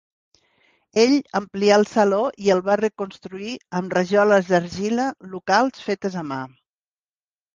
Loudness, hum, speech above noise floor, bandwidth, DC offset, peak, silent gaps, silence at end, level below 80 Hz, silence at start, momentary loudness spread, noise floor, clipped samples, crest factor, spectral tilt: -20 LUFS; none; over 70 dB; 9.6 kHz; under 0.1%; -2 dBFS; none; 1.05 s; -62 dBFS; 0.95 s; 15 LU; under -90 dBFS; under 0.1%; 18 dB; -5 dB/octave